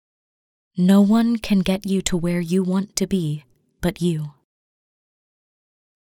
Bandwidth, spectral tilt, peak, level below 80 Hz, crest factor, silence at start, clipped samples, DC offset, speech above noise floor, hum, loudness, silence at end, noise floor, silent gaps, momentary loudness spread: 16.5 kHz; -6 dB/octave; -4 dBFS; -46 dBFS; 18 dB; 0.75 s; under 0.1%; under 0.1%; over 71 dB; none; -20 LUFS; 1.7 s; under -90 dBFS; none; 13 LU